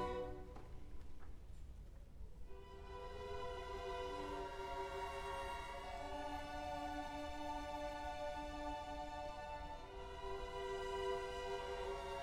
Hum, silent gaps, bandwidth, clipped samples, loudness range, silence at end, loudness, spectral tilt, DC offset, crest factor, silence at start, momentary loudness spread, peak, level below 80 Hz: none; none; 16.5 kHz; under 0.1%; 6 LU; 0 s; -47 LUFS; -5 dB/octave; under 0.1%; 16 dB; 0 s; 14 LU; -30 dBFS; -56 dBFS